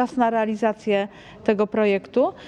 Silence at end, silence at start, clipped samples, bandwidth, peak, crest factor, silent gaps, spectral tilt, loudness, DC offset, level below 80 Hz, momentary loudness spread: 0 s; 0 s; under 0.1%; 9.6 kHz; -4 dBFS; 18 dB; none; -6.5 dB/octave; -22 LUFS; under 0.1%; -60 dBFS; 4 LU